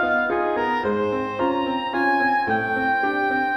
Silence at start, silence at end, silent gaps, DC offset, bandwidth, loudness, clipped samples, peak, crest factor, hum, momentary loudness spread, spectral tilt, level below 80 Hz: 0 s; 0 s; none; under 0.1%; 13 kHz; -22 LUFS; under 0.1%; -10 dBFS; 12 dB; none; 4 LU; -6.5 dB/octave; -54 dBFS